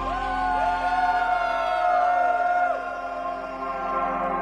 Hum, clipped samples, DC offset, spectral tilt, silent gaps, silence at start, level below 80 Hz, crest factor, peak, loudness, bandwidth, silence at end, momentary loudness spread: none; under 0.1%; under 0.1%; -5 dB/octave; none; 0 s; -46 dBFS; 14 dB; -10 dBFS; -24 LUFS; 9.2 kHz; 0 s; 9 LU